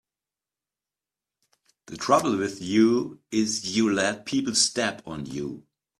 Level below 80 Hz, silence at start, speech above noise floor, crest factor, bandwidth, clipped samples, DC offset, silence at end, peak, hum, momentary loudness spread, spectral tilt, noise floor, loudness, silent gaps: -64 dBFS; 1.9 s; over 65 dB; 20 dB; 13.5 kHz; under 0.1%; under 0.1%; 0.4 s; -6 dBFS; none; 13 LU; -3.5 dB/octave; under -90 dBFS; -24 LUFS; none